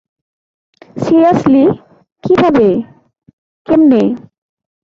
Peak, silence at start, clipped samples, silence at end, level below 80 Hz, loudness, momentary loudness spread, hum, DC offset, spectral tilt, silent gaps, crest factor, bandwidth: -2 dBFS; 0.95 s; under 0.1%; 0.65 s; -48 dBFS; -11 LUFS; 17 LU; none; under 0.1%; -8 dB/octave; 2.12-2.16 s, 3.33-3.65 s; 12 dB; 7.4 kHz